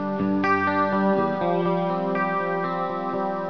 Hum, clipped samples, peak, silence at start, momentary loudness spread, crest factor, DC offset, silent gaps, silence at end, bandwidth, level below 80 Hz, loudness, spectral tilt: none; under 0.1%; -10 dBFS; 0 s; 5 LU; 14 dB; 0.4%; none; 0 s; 5.4 kHz; -62 dBFS; -23 LUFS; -8.5 dB/octave